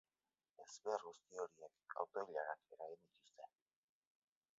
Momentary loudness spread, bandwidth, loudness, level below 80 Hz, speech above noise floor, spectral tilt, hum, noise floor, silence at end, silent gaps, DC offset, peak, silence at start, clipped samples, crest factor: 17 LU; 7.6 kHz; -49 LUFS; under -90 dBFS; over 40 dB; -1 dB/octave; none; under -90 dBFS; 1.1 s; none; under 0.1%; -26 dBFS; 0.6 s; under 0.1%; 24 dB